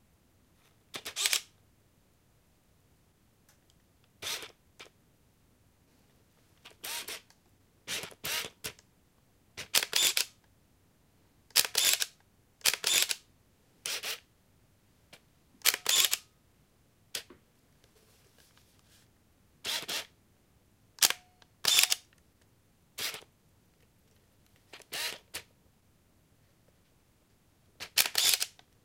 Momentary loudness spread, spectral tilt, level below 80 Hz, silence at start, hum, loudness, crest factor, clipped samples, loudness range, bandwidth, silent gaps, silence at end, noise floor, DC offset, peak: 19 LU; 2 dB/octave; -72 dBFS; 0.95 s; none; -30 LUFS; 34 dB; under 0.1%; 16 LU; 17 kHz; none; 0.35 s; -67 dBFS; under 0.1%; -2 dBFS